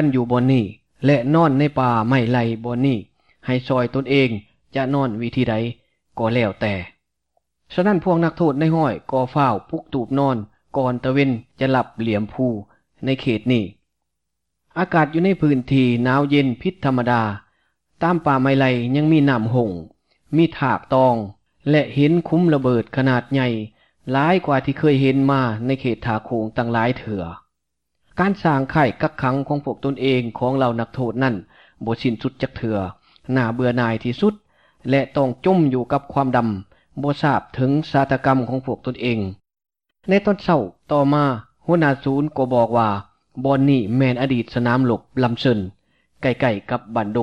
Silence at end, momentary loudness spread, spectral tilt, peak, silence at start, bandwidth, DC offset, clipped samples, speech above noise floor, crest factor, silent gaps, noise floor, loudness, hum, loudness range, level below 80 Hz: 0 s; 9 LU; -8.5 dB/octave; -4 dBFS; 0 s; 6.8 kHz; 0.2%; under 0.1%; 61 dB; 14 dB; none; -79 dBFS; -20 LUFS; none; 4 LU; -52 dBFS